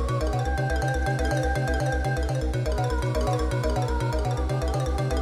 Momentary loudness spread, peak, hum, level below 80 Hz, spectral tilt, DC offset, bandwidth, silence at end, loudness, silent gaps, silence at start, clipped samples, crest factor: 2 LU; -14 dBFS; none; -30 dBFS; -6 dB/octave; under 0.1%; 13.5 kHz; 0 s; -26 LUFS; none; 0 s; under 0.1%; 12 dB